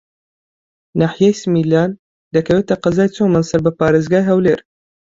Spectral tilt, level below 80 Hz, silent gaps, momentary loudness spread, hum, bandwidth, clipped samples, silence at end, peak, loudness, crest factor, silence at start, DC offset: -7 dB/octave; -48 dBFS; 1.99-2.31 s; 6 LU; none; 7.8 kHz; under 0.1%; 0.55 s; -2 dBFS; -15 LUFS; 14 dB; 0.95 s; under 0.1%